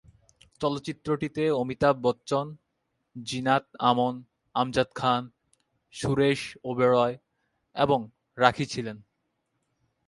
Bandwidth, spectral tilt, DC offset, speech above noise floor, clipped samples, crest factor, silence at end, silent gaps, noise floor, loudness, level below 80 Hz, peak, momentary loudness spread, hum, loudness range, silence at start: 11.5 kHz; -5.5 dB/octave; under 0.1%; 52 dB; under 0.1%; 24 dB; 1.05 s; none; -78 dBFS; -27 LUFS; -58 dBFS; -4 dBFS; 17 LU; none; 2 LU; 0.6 s